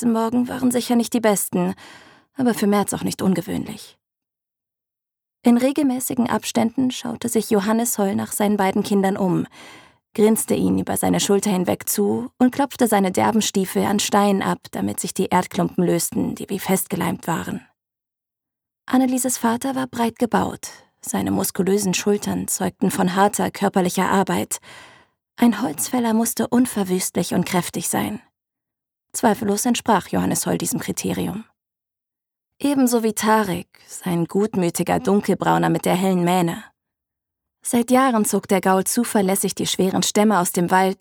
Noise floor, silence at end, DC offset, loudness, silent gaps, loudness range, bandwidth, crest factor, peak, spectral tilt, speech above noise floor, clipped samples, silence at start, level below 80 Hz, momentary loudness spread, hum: -87 dBFS; 0.05 s; under 0.1%; -20 LUFS; none; 4 LU; over 20 kHz; 18 dB; -2 dBFS; -4.5 dB/octave; 67 dB; under 0.1%; 0 s; -58 dBFS; 8 LU; none